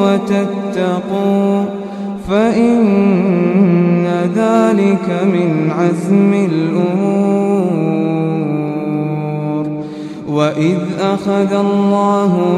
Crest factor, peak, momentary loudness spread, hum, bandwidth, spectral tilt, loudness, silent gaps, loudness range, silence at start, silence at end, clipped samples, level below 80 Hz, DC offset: 14 dB; 0 dBFS; 7 LU; none; 10 kHz; -8 dB/octave; -14 LUFS; none; 5 LU; 0 s; 0 s; under 0.1%; -50 dBFS; under 0.1%